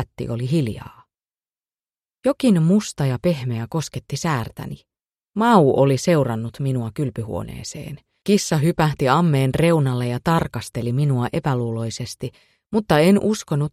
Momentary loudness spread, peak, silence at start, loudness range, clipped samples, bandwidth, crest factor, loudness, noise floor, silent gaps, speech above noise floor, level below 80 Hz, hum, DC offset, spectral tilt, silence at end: 15 LU; 0 dBFS; 0 s; 3 LU; under 0.1%; 14.5 kHz; 20 dB; -20 LUFS; under -90 dBFS; 1.90-1.94 s; over 70 dB; -48 dBFS; none; under 0.1%; -6.5 dB/octave; 0.05 s